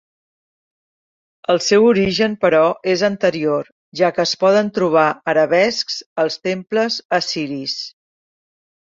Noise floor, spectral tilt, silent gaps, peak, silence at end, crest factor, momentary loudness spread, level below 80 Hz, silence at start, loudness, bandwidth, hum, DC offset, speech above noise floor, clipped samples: under -90 dBFS; -4.5 dB/octave; 3.72-3.92 s, 6.06-6.16 s, 7.05-7.09 s; -2 dBFS; 1.1 s; 16 dB; 9 LU; -56 dBFS; 1.5 s; -17 LUFS; 7.8 kHz; none; under 0.1%; over 73 dB; under 0.1%